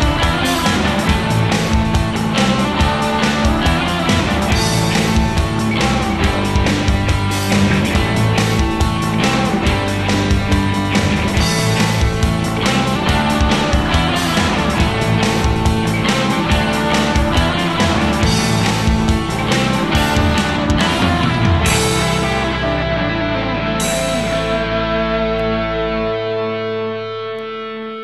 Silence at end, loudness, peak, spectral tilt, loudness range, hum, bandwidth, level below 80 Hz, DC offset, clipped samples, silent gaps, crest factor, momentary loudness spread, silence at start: 0 s; -16 LUFS; -4 dBFS; -5 dB/octave; 2 LU; none; 13 kHz; -24 dBFS; 0.2%; under 0.1%; none; 12 dB; 3 LU; 0 s